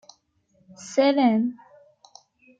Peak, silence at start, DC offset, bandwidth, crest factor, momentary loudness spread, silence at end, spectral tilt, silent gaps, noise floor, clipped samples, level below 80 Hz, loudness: -8 dBFS; 0.8 s; under 0.1%; 8.8 kHz; 18 dB; 12 LU; 1.05 s; -5 dB/octave; none; -65 dBFS; under 0.1%; -76 dBFS; -22 LUFS